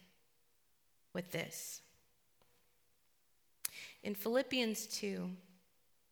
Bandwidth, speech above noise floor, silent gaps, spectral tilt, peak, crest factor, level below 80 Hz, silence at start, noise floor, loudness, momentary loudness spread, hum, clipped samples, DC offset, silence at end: over 20 kHz; 38 dB; none; -3.5 dB/octave; -16 dBFS; 30 dB; -84 dBFS; 1.15 s; -78 dBFS; -40 LUFS; 12 LU; none; under 0.1%; under 0.1%; 0.65 s